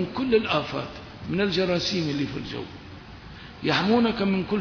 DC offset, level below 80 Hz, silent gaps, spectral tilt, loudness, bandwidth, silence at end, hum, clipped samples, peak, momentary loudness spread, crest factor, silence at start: under 0.1%; -50 dBFS; none; -5.5 dB/octave; -25 LUFS; 5.4 kHz; 0 s; none; under 0.1%; -8 dBFS; 21 LU; 18 dB; 0 s